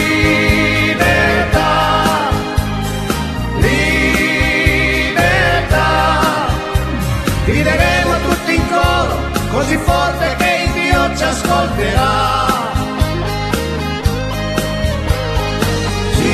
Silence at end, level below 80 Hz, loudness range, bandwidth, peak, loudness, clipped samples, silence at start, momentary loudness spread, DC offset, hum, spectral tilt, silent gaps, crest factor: 0 s; -22 dBFS; 4 LU; 14 kHz; 0 dBFS; -14 LUFS; under 0.1%; 0 s; 6 LU; under 0.1%; none; -5 dB/octave; none; 14 dB